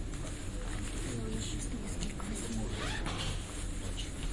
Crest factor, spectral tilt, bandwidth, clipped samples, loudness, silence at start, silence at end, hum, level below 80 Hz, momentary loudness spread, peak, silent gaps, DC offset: 18 dB; -4 dB/octave; 11.5 kHz; under 0.1%; -39 LUFS; 0 s; 0 s; none; -40 dBFS; 4 LU; -20 dBFS; none; under 0.1%